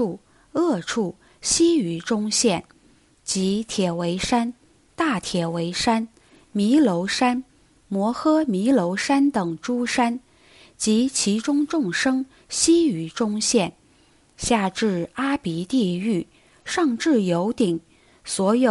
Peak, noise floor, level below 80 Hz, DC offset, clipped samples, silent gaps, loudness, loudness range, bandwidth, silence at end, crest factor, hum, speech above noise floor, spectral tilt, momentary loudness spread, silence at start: -6 dBFS; -57 dBFS; -54 dBFS; under 0.1%; under 0.1%; none; -22 LUFS; 3 LU; 11.5 kHz; 0 s; 18 dB; none; 36 dB; -4 dB/octave; 10 LU; 0 s